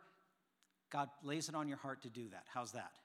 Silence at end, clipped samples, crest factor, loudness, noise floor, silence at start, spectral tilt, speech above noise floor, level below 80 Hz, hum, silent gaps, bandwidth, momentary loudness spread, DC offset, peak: 0.05 s; under 0.1%; 20 dB; -46 LUFS; -81 dBFS; 0 s; -4 dB/octave; 35 dB; under -90 dBFS; none; none; 16 kHz; 7 LU; under 0.1%; -26 dBFS